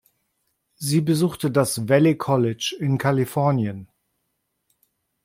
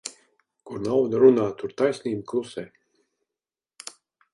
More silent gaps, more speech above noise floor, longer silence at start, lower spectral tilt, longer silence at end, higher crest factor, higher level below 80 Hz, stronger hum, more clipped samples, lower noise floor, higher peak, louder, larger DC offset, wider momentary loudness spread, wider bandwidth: neither; second, 55 dB vs over 68 dB; first, 0.8 s vs 0.05 s; about the same, -6 dB/octave vs -6 dB/octave; second, 1.4 s vs 1.65 s; about the same, 20 dB vs 20 dB; about the same, -62 dBFS vs -66 dBFS; neither; neither; second, -75 dBFS vs under -90 dBFS; about the same, -4 dBFS vs -4 dBFS; about the same, -21 LUFS vs -23 LUFS; neither; second, 7 LU vs 23 LU; first, 16.5 kHz vs 11.5 kHz